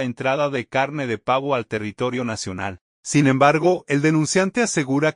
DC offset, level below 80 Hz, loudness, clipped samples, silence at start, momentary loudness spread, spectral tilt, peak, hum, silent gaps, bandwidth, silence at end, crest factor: under 0.1%; -60 dBFS; -20 LUFS; under 0.1%; 0 s; 11 LU; -5 dB/octave; -2 dBFS; none; 2.81-3.03 s; 11 kHz; 0.05 s; 18 dB